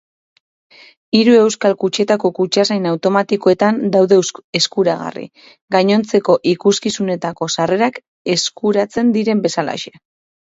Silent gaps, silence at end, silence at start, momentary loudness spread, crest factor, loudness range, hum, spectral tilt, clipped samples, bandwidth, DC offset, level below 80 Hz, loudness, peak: 4.44-4.53 s, 5.61-5.68 s, 8.08-8.25 s; 0.55 s; 1.15 s; 9 LU; 16 dB; 3 LU; none; -4.5 dB/octave; under 0.1%; 8 kHz; under 0.1%; -60 dBFS; -15 LUFS; 0 dBFS